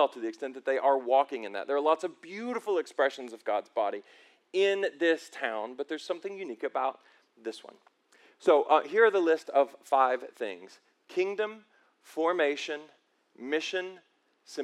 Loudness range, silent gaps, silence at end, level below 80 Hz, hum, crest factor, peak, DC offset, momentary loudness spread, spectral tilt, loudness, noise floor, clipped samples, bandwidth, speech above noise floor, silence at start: 7 LU; none; 0 s; under -90 dBFS; none; 22 dB; -8 dBFS; under 0.1%; 14 LU; -3.5 dB/octave; -29 LUFS; -63 dBFS; under 0.1%; 12.5 kHz; 33 dB; 0 s